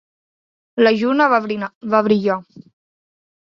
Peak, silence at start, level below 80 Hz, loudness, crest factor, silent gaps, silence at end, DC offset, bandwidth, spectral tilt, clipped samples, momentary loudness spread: -2 dBFS; 0.75 s; -66 dBFS; -17 LUFS; 18 dB; 1.75-1.81 s; 1 s; under 0.1%; 7 kHz; -7 dB/octave; under 0.1%; 11 LU